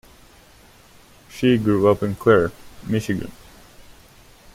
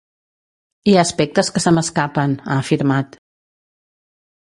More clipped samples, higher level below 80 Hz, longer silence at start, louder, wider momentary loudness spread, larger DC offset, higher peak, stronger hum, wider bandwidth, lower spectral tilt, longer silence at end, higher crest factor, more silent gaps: neither; about the same, -50 dBFS vs -54 dBFS; first, 1.35 s vs 0.85 s; second, -20 LUFS vs -17 LUFS; first, 19 LU vs 7 LU; neither; about the same, -4 dBFS vs -2 dBFS; neither; first, 16 kHz vs 11.5 kHz; first, -7 dB/octave vs -5 dB/octave; second, 1.2 s vs 1.5 s; about the same, 20 dB vs 18 dB; neither